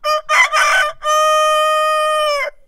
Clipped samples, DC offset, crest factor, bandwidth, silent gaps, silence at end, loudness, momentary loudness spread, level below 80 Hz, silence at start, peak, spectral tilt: under 0.1%; under 0.1%; 14 dB; 16 kHz; none; 0.15 s; -13 LUFS; 4 LU; -48 dBFS; 0.05 s; -2 dBFS; 3 dB/octave